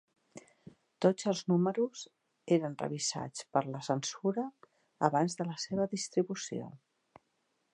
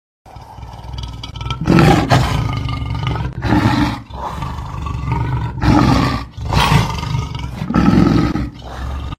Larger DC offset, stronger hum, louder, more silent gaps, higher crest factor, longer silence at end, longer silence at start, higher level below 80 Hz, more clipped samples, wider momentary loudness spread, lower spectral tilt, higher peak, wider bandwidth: neither; neither; second, -33 LUFS vs -16 LUFS; neither; first, 24 dB vs 16 dB; first, 1 s vs 0.05 s; about the same, 0.35 s vs 0.25 s; second, -78 dBFS vs -26 dBFS; neither; second, 13 LU vs 16 LU; second, -5 dB/octave vs -6.5 dB/octave; second, -10 dBFS vs 0 dBFS; second, 11 kHz vs 16 kHz